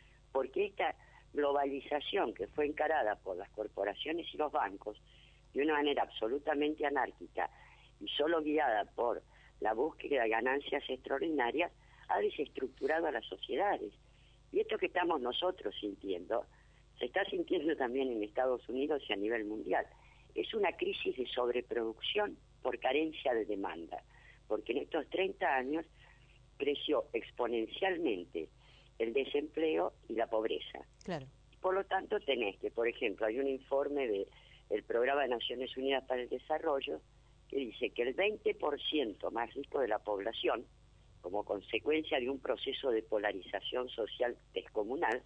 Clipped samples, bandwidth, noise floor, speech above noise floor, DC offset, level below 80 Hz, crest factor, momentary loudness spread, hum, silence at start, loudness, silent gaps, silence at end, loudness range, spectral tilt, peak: under 0.1%; 8.6 kHz; -63 dBFS; 27 dB; under 0.1%; -64 dBFS; 18 dB; 8 LU; none; 0.35 s; -36 LUFS; none; 0.05 s; 2 LU; -5.5 dB/octave; -18 dBFS